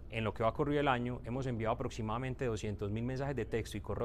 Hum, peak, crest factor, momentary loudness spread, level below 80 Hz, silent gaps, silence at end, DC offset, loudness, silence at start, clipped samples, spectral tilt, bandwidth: none; -16 dBFS; 20 dB; 6 LU; -50 dBFS; none; 0 s; under 0.1%; -36 LUFS; 0 s; under 0.1%; -6.5 dB/octave; 14 kHz